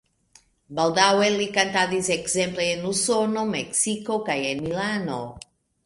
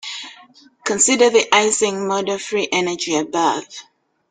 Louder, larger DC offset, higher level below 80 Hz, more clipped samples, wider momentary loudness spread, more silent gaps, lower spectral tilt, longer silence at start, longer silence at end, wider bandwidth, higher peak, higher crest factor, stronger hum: second, -23 LUFS vs -17 LUFS; neither; first, -58 dBFS vs -64 dBFS; neither; second, 8 LU vs 17 LU; neither; about the same, -3 dB/octave vs -2 dB/octave; first, 0.7 s vs 0.05 s; about the same, 0.45 s vs 0.5 s; first, 11.5 kHz vs 9.8 kHz; about the same, -2 dBFS vs -2 dBFS; about the same, 22 dB vs 18 dB; neither